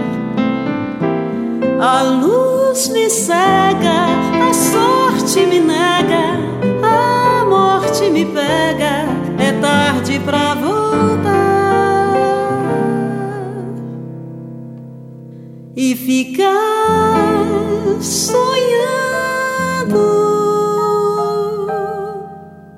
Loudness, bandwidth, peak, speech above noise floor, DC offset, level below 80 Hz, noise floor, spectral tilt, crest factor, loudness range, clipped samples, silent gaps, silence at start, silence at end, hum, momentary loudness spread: -14 LUFS; 16 kHz; 0 dBFS; 21 dB; under 0.1%; -50 dBFS; -34 dBFS; -4.5 dB/octave; 14 dB; 6 LU; under 0.1%; none; 0 s; 0 s; none; 13 LU